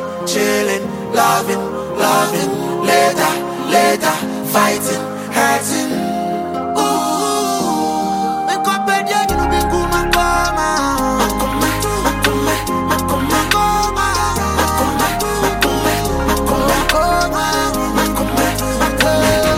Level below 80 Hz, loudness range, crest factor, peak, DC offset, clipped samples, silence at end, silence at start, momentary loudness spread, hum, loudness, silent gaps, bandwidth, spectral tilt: -30 dBFS; 2 LU; 16 dB; 0 dBFS; under 0.1%; under 0.1%; 0 s; 0 s; 5 LU; none; -15 LUFS; none; 16.5 kHz; -3.5 dB/octave